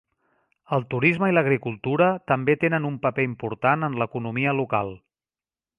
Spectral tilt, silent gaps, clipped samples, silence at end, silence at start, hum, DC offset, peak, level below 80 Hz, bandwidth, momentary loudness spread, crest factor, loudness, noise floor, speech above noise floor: -9 dB/octave; none; under 0.1%; 0.8 s; 0.7 s; none; under 0.1%; -4 dBFS; -60 dBFS; 10 kHz; 7 LU; 20 dB; -23 LUFS; under -90 dBFS; over 67 dB